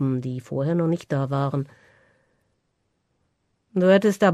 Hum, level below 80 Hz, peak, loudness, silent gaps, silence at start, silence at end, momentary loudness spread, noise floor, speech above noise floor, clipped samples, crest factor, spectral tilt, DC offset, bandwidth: none; -64 dBFS; -6 dBFS; -23 LUFS; none; 0 s; 0 s; 12 LU; -73 dBFS; 51 dB; under 0.1%; 18 dB; -7.5 dB/octave; under 0.1%; 13.5 kHz